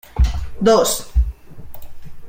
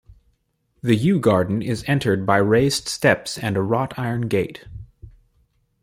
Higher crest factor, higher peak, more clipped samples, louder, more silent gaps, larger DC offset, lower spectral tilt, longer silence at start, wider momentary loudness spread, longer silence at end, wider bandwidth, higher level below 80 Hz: about the same, 16 dB vs 20 dB; about the same, -2 dBFS vs -2 dBFS; neither; about the same, -18 LUFS vs -20 LUFS; neither; neither; about the same, -5 dB/octave vs -5.5 dB/octave; about the same, 0.15 s vs 0.1 s; second, 8 LU vs 11 LU; second, 0 s vs 0.75 s; about the same, 16.5 kHz vs 16 kHz; first, -22 dBFS vs -50 dBFS